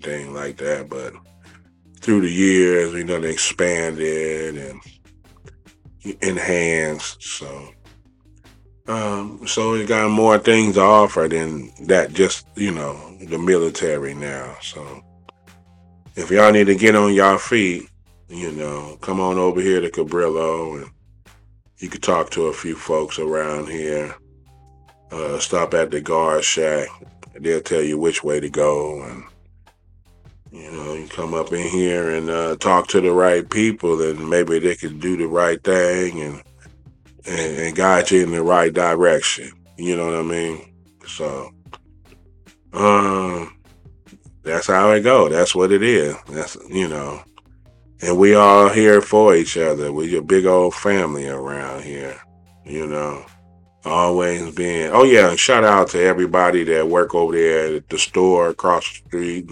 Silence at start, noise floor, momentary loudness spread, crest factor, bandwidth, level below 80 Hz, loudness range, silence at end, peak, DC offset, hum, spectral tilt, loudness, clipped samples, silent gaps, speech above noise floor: 0 s; -52 dBFS; 18 LU; 18 dB; 11 kHz; -50 dBFS; 10 LU; 0 s; 0 dBFS; under 0.1%; none; -4 dB/octave; -17 LUFS; under 0.1%; none; 34 dB